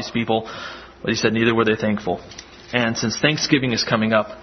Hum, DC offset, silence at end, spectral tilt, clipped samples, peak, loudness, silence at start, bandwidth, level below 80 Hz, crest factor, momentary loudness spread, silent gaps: none; under 0.1%; 0 s; -4.5 dB/octave; under 0.1%; -2 dBFS; -20 LUFS; 0 s; 6.4 kHz; -52 dBFS; 20 dB; 14 LU; none